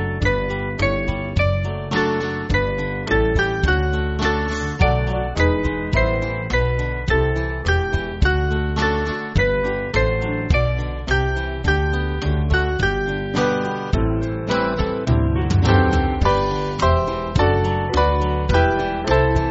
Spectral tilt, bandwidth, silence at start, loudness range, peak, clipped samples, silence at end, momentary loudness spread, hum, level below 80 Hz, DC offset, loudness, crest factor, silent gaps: -5 dB/octave; 8 kHz; 0 s; 2 LU; -2 dBFS; under 0.1%; 0 s; 5 LU; none; -26 dBFS; under 0.1%; -20 LUFS; 16 dB; none